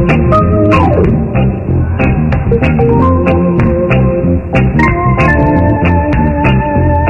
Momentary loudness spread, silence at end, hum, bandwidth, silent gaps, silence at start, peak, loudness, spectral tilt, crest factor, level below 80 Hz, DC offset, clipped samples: 3 LU; 0 s; none; 6.8 kHz; none; 0 s; 0 dBFS; -10 LUFS; -9.5 dB/octave; 8 dB; -20 dBFS; under 0.1%; 0.1%